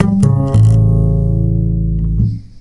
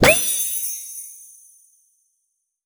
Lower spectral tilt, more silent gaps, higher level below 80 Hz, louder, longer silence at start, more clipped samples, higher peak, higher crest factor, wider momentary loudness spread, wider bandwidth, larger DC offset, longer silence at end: first, -10 dB/octave vs -2 dB/octave; neither; first, -20 dBFS vs -46 dBFS; first, -13 LUFS vs -19 LUFS; about the same, 0 s vs 0 s; neither; about the same, 0 dBFS vs 0 dBFS; second, 12 dB vs 22 dB; second, 7 LU vs 25 LU; second, 10.5 kHz vs over 20 kHz; first, 0.5% vs under 0.1%; second, 0.15 s vs 1.4 s